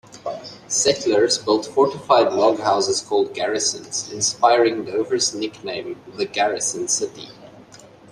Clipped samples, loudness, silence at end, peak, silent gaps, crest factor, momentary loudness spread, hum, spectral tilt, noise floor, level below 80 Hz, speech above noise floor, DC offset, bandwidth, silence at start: under 0.1%; -20 LUFS; 0.5 s; -2 dBFS; none; 18 dB; 14 LU; none; -2 dB/octave; -45 dBFS; -64 dBFS; 25 dB; under 0.1%; 13 kHz; 0.1 s